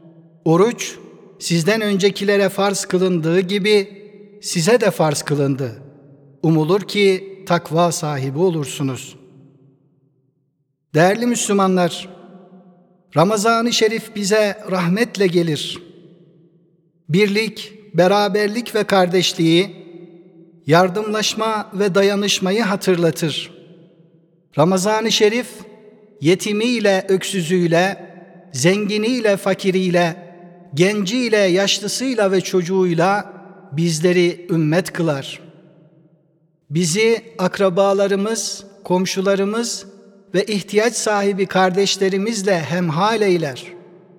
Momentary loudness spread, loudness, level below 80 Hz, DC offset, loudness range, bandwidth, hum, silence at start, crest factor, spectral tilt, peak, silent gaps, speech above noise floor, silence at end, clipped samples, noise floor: 10 LU; -18 LUFS; -70 dBFS; under 0.1%; 3 LU; 18 kHz; none; 0.45 s; 18 dB; -4.5 dB/octave; 0 dBFS; none; 51 dB; 0.4 s; under 0.1%; -68 dBFS